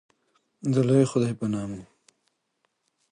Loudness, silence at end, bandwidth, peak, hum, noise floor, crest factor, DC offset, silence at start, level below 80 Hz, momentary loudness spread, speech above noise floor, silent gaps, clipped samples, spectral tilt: -25 LUFS; 1.3 s; 10 kHz; -8 dBFS; none; -75 dBFS; 20 dB; under 0.1%; 0.65 s; -62 dBFS; 14 LU; 51 dB; none; under 0.1%; -7.5 dB/octave